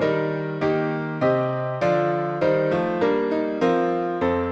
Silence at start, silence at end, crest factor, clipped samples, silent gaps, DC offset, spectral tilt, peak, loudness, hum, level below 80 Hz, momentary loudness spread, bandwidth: 0 s; 0 s; 16 dB; under 0.1%; none; under 0.1%; -8 dB/octave; -6 dBFS; -23 LUFS; none; -54 dBFS; 3 LU; 8 kHz